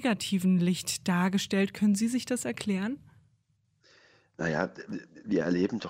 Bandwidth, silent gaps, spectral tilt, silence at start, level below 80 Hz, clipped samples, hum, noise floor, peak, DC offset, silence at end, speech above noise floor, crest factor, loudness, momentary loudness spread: 16 kHz; none; -5 dB/octave; 0 s; -66 dBFS; under 0.1%; none; -72 dBFS; -12 dBFS; under 0.1%; 0 s; 43 dB; 18 dB; -29 LUFS; 10 LU